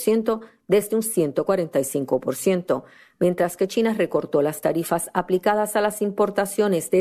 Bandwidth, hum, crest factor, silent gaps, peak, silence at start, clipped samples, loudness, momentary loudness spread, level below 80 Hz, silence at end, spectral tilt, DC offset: 14.5 kHz; none; 16 dB; none; -6 dBFS; 0 s; under 0.1%; -23 LUFS; 3 LU; -62 dBFS; 0 s; -5 dB/octave; under 0.1%